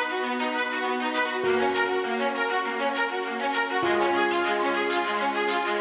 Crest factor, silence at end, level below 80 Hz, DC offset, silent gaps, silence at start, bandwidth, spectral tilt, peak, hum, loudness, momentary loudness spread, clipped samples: 14 dB; 0 s; -66 dBFS; under 0.1%; none; 0 s; 4 kHz; -0.5 dB/octave; -12 dBFS; none; -25 LUFS; 3 LU; under 0.1%